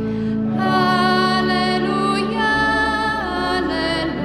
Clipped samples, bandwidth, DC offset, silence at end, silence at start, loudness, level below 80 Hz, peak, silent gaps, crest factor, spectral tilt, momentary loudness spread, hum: under 0.1%; 12.5 kHz; under 0.1%; 0 s; 0 s; -18 LUFS; -40 dBFS; -4 dBFS; none; 14 dB; -5.5 dB/octave; 5 LU; none